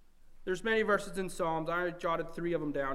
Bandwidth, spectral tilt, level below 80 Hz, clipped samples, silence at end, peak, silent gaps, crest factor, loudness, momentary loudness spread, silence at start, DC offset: 15.5 kHz; -5 dB/octave; -50 dBFS; under 0.1%; 0 s; -16 dBFS; none; 18 dB; -33 LUFS; 8 LU; 0 s; under 0.1%